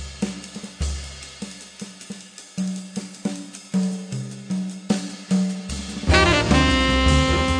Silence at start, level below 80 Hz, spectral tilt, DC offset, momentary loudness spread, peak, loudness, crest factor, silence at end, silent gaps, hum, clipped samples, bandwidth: 0 s; -30 dBFS; -4.5 dB/octave; under 0.1%; 19 LU; -2 dBFS; -22 LUFS; 22 dB; 0 s; none; none; under 0.1%; 10 kHz